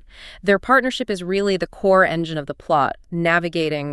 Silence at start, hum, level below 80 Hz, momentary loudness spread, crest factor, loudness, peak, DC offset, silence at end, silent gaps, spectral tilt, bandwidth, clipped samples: 0.15 s; none; -48 dBFS; 9 LU; 18 dB; -19 LUFS; -2 dBFS; under 0.1%; 0 s; none; -5.5 dB/octave; 12 kHz; under 0.1%